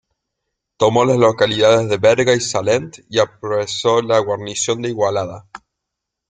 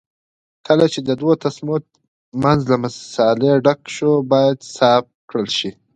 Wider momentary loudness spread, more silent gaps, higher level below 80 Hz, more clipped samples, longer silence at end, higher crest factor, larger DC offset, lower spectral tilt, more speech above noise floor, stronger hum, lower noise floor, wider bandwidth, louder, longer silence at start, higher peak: about the same, 8 LU vs 9 LU; second, none vs 2.08-2.32 s, 5.15-5.28 s; about the same, -56 dBFS vs -54 dBFS; neither; first, 0.75 s vs 0.25 s; about the same, 16 dB vs 18 dB; neither; second, -4 dB/octave vs -6 dB/octave; second, 64 dB vs over 74 dB; neither; second, -80 dBFS vs under -90 dBFS; about the same, 9.6 kHz vs 9.4 kHz; about the same, -16 LUFS vs -17 LUFS; about the same, 0.8 s vs 0.7 s; about the same, -2 dBFS vs 0 dBFS